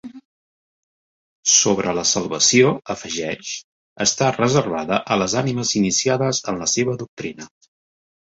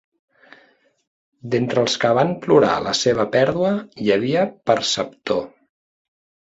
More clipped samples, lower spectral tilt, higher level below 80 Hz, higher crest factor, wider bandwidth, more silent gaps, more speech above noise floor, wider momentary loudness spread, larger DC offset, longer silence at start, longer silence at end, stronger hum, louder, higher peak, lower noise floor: neither; second, -3 dB/octave vs -4.5 dB/octave; about the same, -56 dBFS vs -56 dBFS; about the same, 18 dB vs 18 dB; about the same, 8.2 kHz vs 8 kHz; first, 0.25-1.43 s, 3.64-3.96 s, 7.08-7.17 s vs none; first, over 70 dB vs 38 dB; first, 14 LU vs 8 LU; neither; second, 0.05 s vs 1.45 s; second, 0.8 s vs 1 s; neither; about the same, -18 LUFS vs -19 LUFS; about the same, -2 dBFS vs -2 dBFS; first, under -90 dBFS vs -57 dBFS